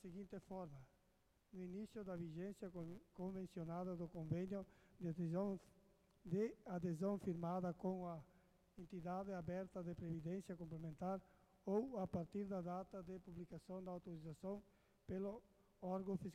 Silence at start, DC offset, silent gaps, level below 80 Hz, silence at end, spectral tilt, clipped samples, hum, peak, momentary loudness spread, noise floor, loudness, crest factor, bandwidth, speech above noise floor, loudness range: 0.05 s; under 0.1%; none; -72 dBFS; 0 s; -9 dB/octave; under 0.1%; none; -30 dBFS; 11 LU; -79 dBFS; -49 LUFS; 20 dB; 13.5 kHz; 31 dB; 5 LU